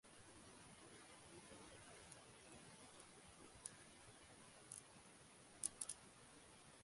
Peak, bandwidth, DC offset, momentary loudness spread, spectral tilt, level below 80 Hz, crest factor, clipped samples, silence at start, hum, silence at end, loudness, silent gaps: -20 dBFS; 11.5 kHz; under 0.1%; 14 LU; -2 dB/octave; -80 dBFS; 40 dB; under 0.1%; 0.05 s; none; 0 s; -57 LUFS; none